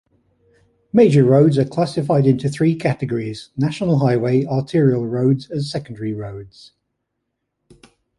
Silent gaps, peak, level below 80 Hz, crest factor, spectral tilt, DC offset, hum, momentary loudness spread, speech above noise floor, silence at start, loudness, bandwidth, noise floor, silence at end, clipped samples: none; -2 dBFS; -54 dBFS; 16 dB; -8 dB/octave; under 0.1%; none; 13 LU; 59 dB; 0.95 s; -18 LUFS; 11.5 kHz; -76 dBFS; 1.7 s; under 0.1%